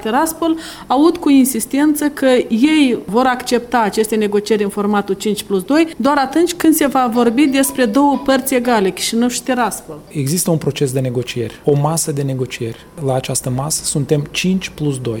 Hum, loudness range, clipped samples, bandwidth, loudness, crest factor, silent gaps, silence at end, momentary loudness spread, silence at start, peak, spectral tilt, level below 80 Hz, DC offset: none; 4 LU; under 0.1%; 18 kHz; -15 LUFS; 14 dB; none; 0 s; 7 LU; 0 s; 0 dBFS; -5 dB/octave; -46 dBFS; under 0.1%